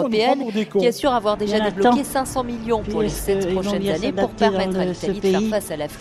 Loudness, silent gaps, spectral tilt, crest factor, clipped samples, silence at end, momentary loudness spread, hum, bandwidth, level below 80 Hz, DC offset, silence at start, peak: -21 LUFS; none; -5 dB/octave; 16 dB; under 0.1%; 0 s; 5 LU; none; 15.5 kHz; -42 dBFS; under 0.1%; 0 s; -4 dBFS